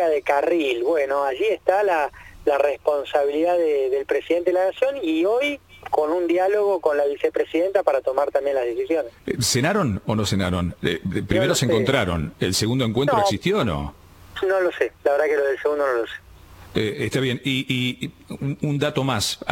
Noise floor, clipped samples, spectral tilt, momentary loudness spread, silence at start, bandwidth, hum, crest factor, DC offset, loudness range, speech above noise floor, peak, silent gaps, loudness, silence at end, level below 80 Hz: -45 dBFS; under 0.1%; -5 dB/octave; 6 LU; 0 s; 17 kHz; none; 18 dB; under 0.1%; 2 LU; 23 dB; -4 dBFS; none; -22 LUFS; 0 s; -48 dBFS